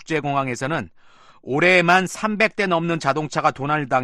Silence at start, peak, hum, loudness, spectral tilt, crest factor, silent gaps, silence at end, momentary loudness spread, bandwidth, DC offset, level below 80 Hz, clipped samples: 0 s; -4 dBFS; none; -20 LUFS; -5 dB/octave; 18 dB; none; 0 s; 11 LU; 12.5 kHz; under 0.1%; -58 dBFS; under 0.1%